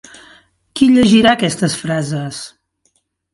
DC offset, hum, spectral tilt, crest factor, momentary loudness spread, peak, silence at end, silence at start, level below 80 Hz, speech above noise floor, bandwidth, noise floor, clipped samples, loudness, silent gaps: under 0.1%; none; -5 dB/octave; 16 dB; 20 LU; 0 dBFS; 0.85 s; 0.75 s; -48 dBFS; 50 dB; 11.5 kHz; -63 dBFS; under 0.1%; -13 LUFS; none